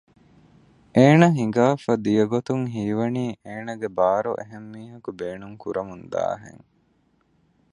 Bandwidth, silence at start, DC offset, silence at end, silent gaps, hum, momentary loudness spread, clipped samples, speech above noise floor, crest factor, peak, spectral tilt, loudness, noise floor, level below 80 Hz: 10.5 kHz; 0.95 s; under 0.1%; 1.25 s; none; none; 19 LU; under 0.1%; 42 dB; 22 dB; -2 dBFS; -7.5 dB/octave; -22 LUFS; -64 dBFS; -62 dBFS